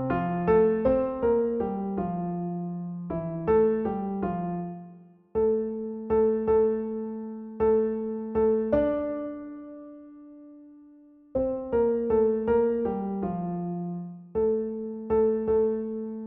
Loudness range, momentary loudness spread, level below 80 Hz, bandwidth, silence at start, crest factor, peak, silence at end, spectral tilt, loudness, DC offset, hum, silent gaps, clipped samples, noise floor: 4 LU; 12 LU; -50 dBFS; 3.5 kHz; 0 s; 16 dB; -10 dBFS; 0 s; -9.5 dB/octave; -27 LUFS; under 0.1%; none; none; under 0.1%; -53 dBFS